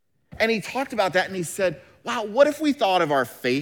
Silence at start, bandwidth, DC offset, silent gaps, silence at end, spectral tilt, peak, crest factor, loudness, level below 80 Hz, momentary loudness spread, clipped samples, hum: 0.3 s; over 20 kHz; under 0.1%; none; 0 s; -4 dB/octave; -4 dBFS; 18 dB; -23 LUFS; -62 dBFS; 8 LU; under 0.1%; none